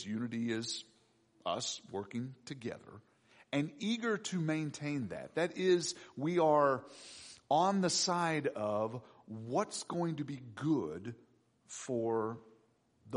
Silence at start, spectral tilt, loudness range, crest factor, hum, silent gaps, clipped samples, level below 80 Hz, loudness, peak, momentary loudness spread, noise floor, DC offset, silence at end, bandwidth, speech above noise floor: 0 s; -4.5 dB/octave; 8 LU; 18 dB; none; none; under 0.1%; -78 dBFS; -35 LUFS; -18 dBFS; 17 LU; -71 dBFS; under 0.1%; 0 s; 10.5 kHz; 36 dB